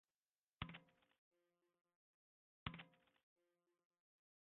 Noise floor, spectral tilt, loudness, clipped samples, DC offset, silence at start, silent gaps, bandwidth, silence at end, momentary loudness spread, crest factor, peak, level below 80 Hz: under -90 dBFS; -3.5 dB/octave; -56 LUFS; under 0.1%; under 0.1%; 0.6 s; 1.18-1.31 s, 1.81-1.85 s, 1.95-2.66 s; 3.9 kHz; 1.55 s; 9 LU; 32 dB; -30 dBFS; -74 dBFS